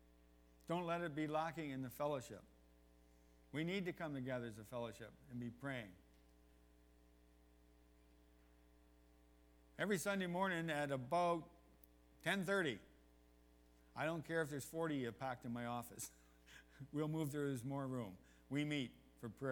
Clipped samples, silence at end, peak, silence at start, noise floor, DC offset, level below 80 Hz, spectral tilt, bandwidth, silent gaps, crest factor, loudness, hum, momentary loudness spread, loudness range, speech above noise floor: under 0.1%; 0 s; -26 dBFS; 0.65 s; -69 dBFS; under 0.1%; -72 dBFS; -5.5 dB/octave; over 20 kHz; none; 20 dB; -44 LUFS; 60 Hz at -70 dBFS; 15 LU; 9 LU; 26 dB